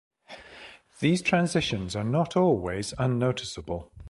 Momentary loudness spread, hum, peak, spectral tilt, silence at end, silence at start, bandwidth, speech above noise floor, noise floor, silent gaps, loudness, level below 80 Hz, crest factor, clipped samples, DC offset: 22 LU; none; -10 dBFS; -5.5 dB/octave; 0 s; 0.3 s; 11.5 kHz; 23 dB; -49 dBFS; none; -27 LUFS; -50 dBFS; 18 dB; under 0.1%; under 0.1%